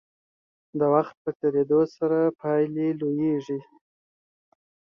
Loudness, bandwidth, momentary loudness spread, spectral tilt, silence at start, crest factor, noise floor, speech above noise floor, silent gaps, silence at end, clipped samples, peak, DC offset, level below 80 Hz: -25 LUFS; 6.6 kHz; 9 LU; -9.5 dB/octave; 0.75 s; 20 dB; under -90 dBFS; over 66 dB; 1.17-1.25 s, 1.35-1.40 s; 1.35 s; under 0.1%; -6 dBFS; under 0.1%; -70 dBFS